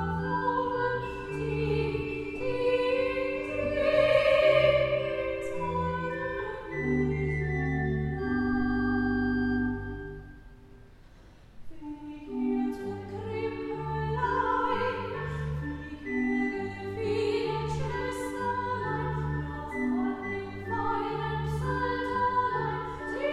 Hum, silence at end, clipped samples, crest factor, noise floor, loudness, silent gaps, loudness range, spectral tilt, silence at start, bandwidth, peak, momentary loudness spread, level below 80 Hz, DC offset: none; 0 s; under 0.1%; 18 dB; -52 dBFS; -30 LUFS; none; 9 LU; -7 dB/octave; 0 s; 13 kHz; -10 dBFS; 9 LU; -46 dBFS; under 0.1%